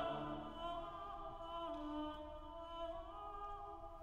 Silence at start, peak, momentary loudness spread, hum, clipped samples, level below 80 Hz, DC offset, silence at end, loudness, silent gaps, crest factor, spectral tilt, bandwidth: 0 s; -32 dBFS; 6 LU; none; under 0.1%; -58 dBFS; under 0.1%; 0 s; -49 LUFS; none; 16 dB; -6.5 dB/octave; 14.5 kHz